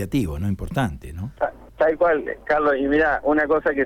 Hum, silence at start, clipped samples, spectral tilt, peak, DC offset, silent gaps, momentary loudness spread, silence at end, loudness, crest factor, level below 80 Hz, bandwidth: none; 0 s; under 0.1%; -7 dB/octave; -8 dBFS; under 0.1%; none; 9 LU; 0 s; -21 LUFS; 12 dB; -40 dBFS; 16 kHz